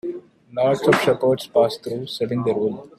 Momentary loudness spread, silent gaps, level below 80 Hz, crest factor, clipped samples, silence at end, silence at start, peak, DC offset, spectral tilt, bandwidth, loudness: 13 LU; none; -60 dBFS; 18 dB; under 0.1%; 0.1 s; 0.05 s; -2 dBFS; under 0.1%; -6 dB/octave; 14.5 kHz; -20 LUFS